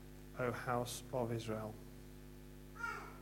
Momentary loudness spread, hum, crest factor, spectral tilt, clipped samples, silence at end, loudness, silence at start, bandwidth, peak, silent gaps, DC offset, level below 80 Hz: 16 LU; 50 Hz at -55 dBFS; 20 dB; -5 dB/octave; under 0.1%; 0 s; -43 LUFS; 0 s; 16.5 kHz; -24 dBFS; none; under 0.1%; -60 dBFS